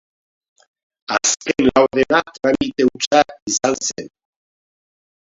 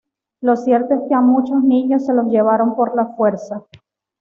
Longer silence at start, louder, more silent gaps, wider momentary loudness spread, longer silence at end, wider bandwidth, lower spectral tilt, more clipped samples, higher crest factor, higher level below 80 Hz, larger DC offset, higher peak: first, 1.1 s vs 0.4 s; about the same, -17 LUFS vs -16 LUFS; first, 3.07-3.11 s, 3.42-3.46 s vs none; about the same, 9 LU vs 7 LU; first, 1.25 s vs 0.6 s; first, 7.8 kHz vs 6.8 kHz; second, -2.5 dB/octave vs -8.5 dB/octave; neither; first, 20 dB vs 14 dB; first, -50 dBFS vs -64 dBFS; neither; first, 0 dBFS vs -4 dBFS